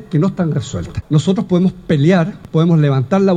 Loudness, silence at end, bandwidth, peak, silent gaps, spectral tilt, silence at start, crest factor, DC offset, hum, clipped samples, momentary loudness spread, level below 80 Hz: -15 LUFS; 0 s; 9.2 kHz; -2 dBFS; none; -8 dB/octave; 0 s; 12 dB; under 0.1%; none; under 0.1%; 7 LU; -42 dBFS